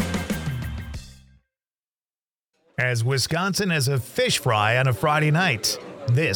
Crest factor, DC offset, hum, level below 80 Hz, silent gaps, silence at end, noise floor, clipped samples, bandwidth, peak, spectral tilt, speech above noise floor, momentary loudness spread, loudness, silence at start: 18 dB; under 0.1%; none; -46 dBFS; 1.79-1.83 s, 2.10-2.14 s, 2.26-2.31 s, 2.40-2.49 s; 0 s; under -90 dBFS; under 0.1%; 19.5 kHz; -6 dBFS; -4.5 dB/octave; over 69 dB; 12 LU; -22 LUFS; 0 s